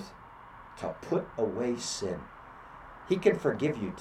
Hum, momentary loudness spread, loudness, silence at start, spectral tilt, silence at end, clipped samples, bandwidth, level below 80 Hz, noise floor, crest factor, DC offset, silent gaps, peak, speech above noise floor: none; 22 LU; -31 LUFS; 0 s; -5 dB/octave; 0 s; under 0.1%; 13.5 kHz; -60 dBFS; -50 dBFS; 22 dB; under 0.1%; none; -10 dBFS; 20 dB